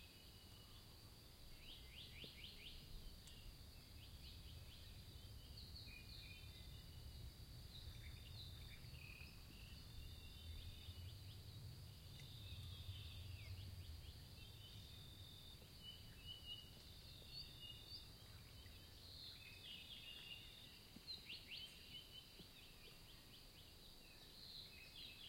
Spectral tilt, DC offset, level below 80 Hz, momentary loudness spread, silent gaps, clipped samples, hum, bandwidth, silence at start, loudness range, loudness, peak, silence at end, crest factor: -3.5 dB/octave; under 0.1%; -64 dBFS; 7 LU; none; under 0.1%; none; 16.5 kHz; 0 s; 3 LU; -58 LUFS; -42 dBFS; 0 s; 16 dB